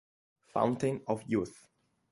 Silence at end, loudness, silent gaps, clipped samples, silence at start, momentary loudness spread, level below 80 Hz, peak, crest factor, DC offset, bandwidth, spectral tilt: 0.6 s; -33 LUFS; none; under 0.1%; 0.55 s; 8 LU; -66 dBFS; -14 dBFS; 22 dB; under 0.1%; 11.5 kHz; -7 dB/octave